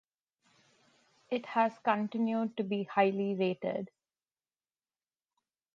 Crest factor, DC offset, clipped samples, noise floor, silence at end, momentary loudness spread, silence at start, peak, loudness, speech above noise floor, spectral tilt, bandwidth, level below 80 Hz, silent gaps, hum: 22 dB; under 0.1%; under 0.1%; under -90 dBFS; 1.9 s; 9 LU; 1.3 s; -14 dBFS; -32 LUFS; over 58 dB; -8 dB/octave; 7.2 kHz; -84 dBFS; none; none